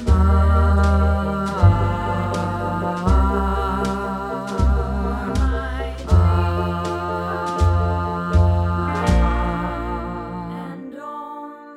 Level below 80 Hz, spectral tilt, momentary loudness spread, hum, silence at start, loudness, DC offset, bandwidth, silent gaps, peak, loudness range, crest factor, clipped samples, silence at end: -22 dBFS; -7.5 dB/octave; 13 LU; none; 0 s; -20 LUFS; under 0.1%; 10.5 kHz; none; -2 dBFS; 3 LU; 18 dB; under 0.1%; 0 s